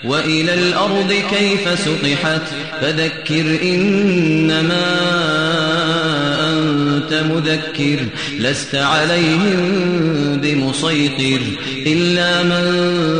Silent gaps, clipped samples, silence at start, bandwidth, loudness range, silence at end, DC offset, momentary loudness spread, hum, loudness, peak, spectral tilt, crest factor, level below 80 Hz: none; under 0.1%; 0 s; 10 kHz; 1 LU; 0 s; 0.5%; 4 LU; none; -15 LUFS; -4 dBFS; -5 dB/octave; 12 dB; -52 dBFS